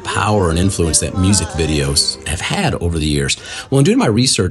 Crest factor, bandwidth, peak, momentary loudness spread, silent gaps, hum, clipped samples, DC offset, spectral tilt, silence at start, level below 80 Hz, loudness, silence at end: 16 dB; 12.5 kHz; 0 dBFS; 6 LU; none; none; under 0.1%; under 0.1%; -4 dB/octave; 0 s; -32 dBFS; -15 LUFS; 0 s